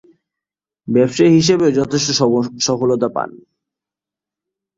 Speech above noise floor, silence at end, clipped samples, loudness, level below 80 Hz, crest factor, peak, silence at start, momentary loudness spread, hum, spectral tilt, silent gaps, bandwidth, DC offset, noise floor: 72 dB; 1.4 s; under 0.1%; -15 LUFS; -54 dBFS; 16 dB; -2 dBFS; 0.85 s; 10 LU; 50 Hz at -60 dBFS; -5 dB/octave; none; 7.8 kHz; under 0.1%; -87 dBFS